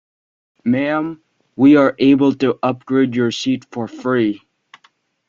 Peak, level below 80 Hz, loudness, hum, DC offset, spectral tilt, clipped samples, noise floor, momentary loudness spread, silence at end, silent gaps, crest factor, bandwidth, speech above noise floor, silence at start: -2 dBFS; -60 dBFS; -16 LUFS; none; under 0.1%; -6.5 dB/octave; under 0.1%; -57 dBFS; 14 LU; 0.9 s; none; 16 dB; 7.4 kHz; 42 dB; 0.65 s